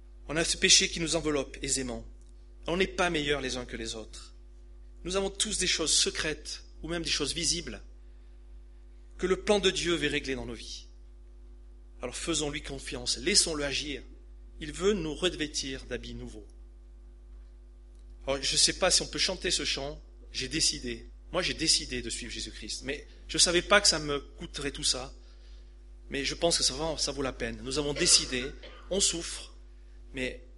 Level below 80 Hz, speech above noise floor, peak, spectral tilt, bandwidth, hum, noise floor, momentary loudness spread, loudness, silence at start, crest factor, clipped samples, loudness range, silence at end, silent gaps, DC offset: -46 dBFS; 20 dB; -6 dBFS; -2 dB/octave; 11.5 kHz; none; -50 dBFS; 18 LU; -28 LUFS; 0 s; 26 dB; under 0.1%; 6 LU; 0 s; none; under 0.1%